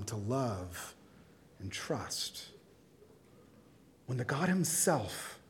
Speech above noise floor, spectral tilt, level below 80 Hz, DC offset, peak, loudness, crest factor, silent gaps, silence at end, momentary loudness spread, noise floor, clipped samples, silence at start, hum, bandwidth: 26 dB; -4 dB/octave; -70 dBFS; under 0.1%; -16 dBFS; -35 LUFS; 22 dB; none; 0.1 s; 19 LU; -61 dBFS; under 0.1%; 0 s; none; 18 kHz